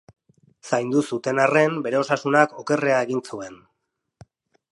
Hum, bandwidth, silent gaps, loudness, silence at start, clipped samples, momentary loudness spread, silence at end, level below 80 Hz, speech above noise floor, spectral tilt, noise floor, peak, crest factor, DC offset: none; 11.5 kHz; none; -21 LUFS; 0.65 s; under 0.1%; 10 LU; 1.2 s; -70 dBFS; 56 dB; -5.5 dB/octave; -77 dBFS; -2 dBFS; 22 dB; under 0.1%